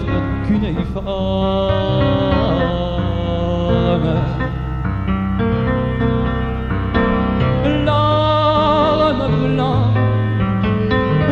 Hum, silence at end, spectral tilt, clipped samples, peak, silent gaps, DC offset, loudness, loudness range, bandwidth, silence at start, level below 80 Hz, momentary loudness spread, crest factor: none; 0 s; -9 dB/octave; under 0.1%; -2 dBFS; none; under 0.1%; -17 LUFS; 3 LU; 6.8 kHz; 0 s; -26 dBFS; 7 LU; 14 dB